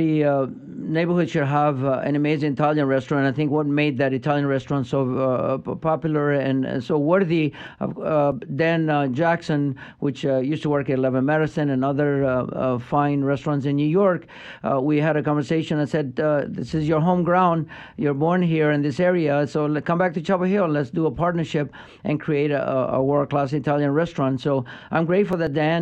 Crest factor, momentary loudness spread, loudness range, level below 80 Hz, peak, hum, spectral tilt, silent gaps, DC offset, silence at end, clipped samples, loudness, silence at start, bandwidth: 16 dB; 6 LU; 2 LU; -54 dBFS; -6 dBFS; none; -8 dB/octave; none; under 0.1%; 0 s; under 0.1%; -22 LUFS; 0 s; 8.4 kHz